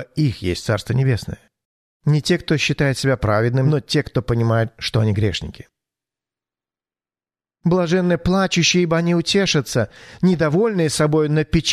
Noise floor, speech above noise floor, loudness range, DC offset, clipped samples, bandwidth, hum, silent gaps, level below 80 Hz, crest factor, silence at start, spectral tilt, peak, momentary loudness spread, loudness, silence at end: under -90 dBFS; over 72 dB; 6 LU; under 0.1%; under 0.1%; 13.5 kHz; none; 1.65-2.00 s; -42 dBFS; 16 dB; 0 s; -5.5 dB/octave; -4 dBFS; 6 LU; -19 LUFS; 0 s